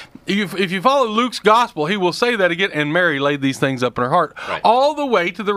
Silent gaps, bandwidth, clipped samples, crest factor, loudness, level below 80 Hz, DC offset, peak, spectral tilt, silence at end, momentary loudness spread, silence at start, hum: none; 15.5 kHz; under 0.1%; 18 dB; -17 LUFS; -58 dBFS; under 0.1%; 0 dBFS; -5 dB/octave; 0 s; 5 LU; 0 s; none